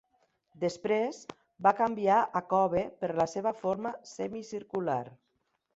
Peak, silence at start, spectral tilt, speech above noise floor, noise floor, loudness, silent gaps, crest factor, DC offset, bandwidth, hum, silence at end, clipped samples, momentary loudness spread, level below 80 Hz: -10 dBFS; 0.6 s; -6 dB/octave; 48 dB; -78 dBFS; -31 LUFS; none; 22 dB; under 0.1%; 8 kHz; none; 0.6 s; under 0.1%; 12 LU; -68 dBFS